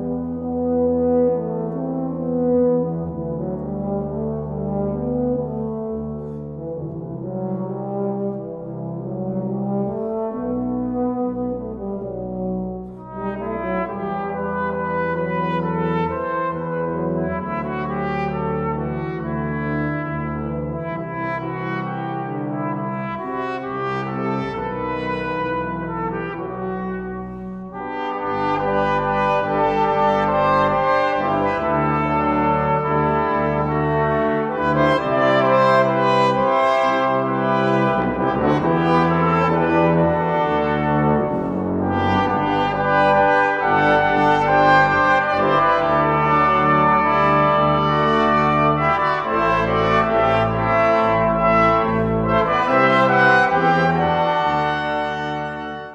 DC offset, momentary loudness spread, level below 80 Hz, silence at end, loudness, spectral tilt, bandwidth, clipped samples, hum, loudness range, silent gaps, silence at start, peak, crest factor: under 0.1%; 11 LU; -42 dBFS; 0 s; -19 LUFS; -7.5 dB/octave; 8.8 kHz; under 0.1%; none; 10 LU; none; 0 s; -2 dBFS; 18 dB